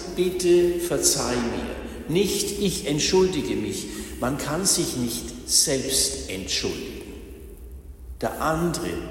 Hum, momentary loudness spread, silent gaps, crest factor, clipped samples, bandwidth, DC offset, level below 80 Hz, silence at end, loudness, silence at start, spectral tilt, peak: none; 19 LU; none; 20 dB; under 0.1%; 16.5 kHz; under 0.1%; -42 dBFS; 0 s; -23 LUFS; 0 s; -3.5 dB/octave; -6 dBFS